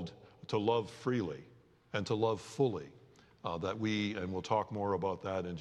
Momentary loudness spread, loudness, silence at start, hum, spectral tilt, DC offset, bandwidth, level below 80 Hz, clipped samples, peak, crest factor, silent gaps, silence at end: 11 LU; -36 LUFS; 0 s; none; -6 dB/octave; under 0.1%; 11.5 kHz; -72 dBFS; under 0.1%; -18 dBFS; 18 dB; none; 0 s